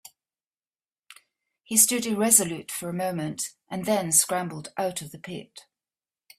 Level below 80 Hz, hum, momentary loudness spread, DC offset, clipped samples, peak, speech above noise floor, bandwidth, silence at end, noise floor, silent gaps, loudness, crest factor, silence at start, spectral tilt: -70 dBFS; none; 17 LU; under 0.1%; under 0.1%; -4 dBFS; over 64 dB; 16 kHz; 0.8 s; under -90 dBFS; none; -23 LUFS; 24 dB; 1.7 s; -2.5 dB/octave